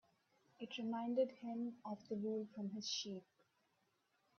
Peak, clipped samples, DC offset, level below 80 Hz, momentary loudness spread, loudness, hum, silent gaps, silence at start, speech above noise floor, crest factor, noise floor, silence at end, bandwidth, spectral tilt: -26 dBFS; under 0.1%; under 0.1%; under -90 dBFS; 11 LU; -44 LUFS; none; none; 0.6 s; 38 dB; 20 dB; -82 dBFS; 1.15 s; 7 kHz; -4 dB/octave